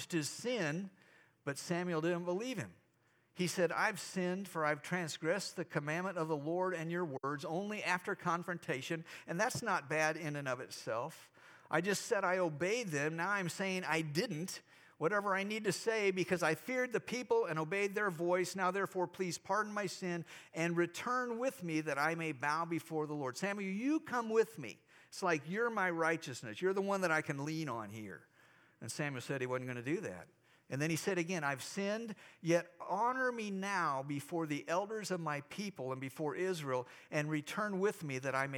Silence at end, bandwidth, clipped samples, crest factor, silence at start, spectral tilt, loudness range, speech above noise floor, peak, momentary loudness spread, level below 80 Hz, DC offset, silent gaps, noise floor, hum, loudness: 0 s; over 20 kHz; under 0.1%; 20 dB; 0 s; -4.5 dB/octave; 3 LU; 36 dB; -18 dBFS; 8 LU; -86 dBFS; under 0.1%; none; -74 dBFS; none; -37 LUFS